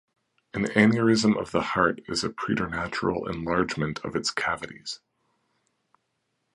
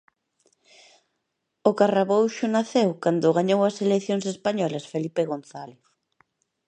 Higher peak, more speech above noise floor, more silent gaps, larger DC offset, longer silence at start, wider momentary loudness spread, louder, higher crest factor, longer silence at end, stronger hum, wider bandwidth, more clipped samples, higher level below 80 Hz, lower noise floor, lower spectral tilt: about the same, -6 dBFS vs -4 dBFS; second, 51 dB vs 56 dB; neither; neither; second, 0.55 s vs 1.65 s; first, 13 LU vs 9 LU; second, -26 LUFS vs -23 LUFS; about the same, 22 dB vs 20 dB; first, 1.6 s vs 0.95 s; neither; first, 11.5 kHz vs 9.6 kHz; neither; first, -54 dBFS vs -76 dBFS; about the same, -77 dBFS vs -79 dBFS; about the same, -5 dB/octave vs -6 dB/octave